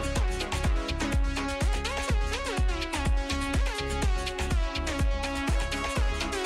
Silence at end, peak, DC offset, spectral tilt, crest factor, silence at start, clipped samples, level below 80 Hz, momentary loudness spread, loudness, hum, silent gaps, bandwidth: 0 s; -16 dBFS; under 0.1%; -4.5 dB/octave; 10 dB; 0 s; under 0.1%; -30 dBFS; 1 LU; -29 LUFS; none; none; 13.5 kHz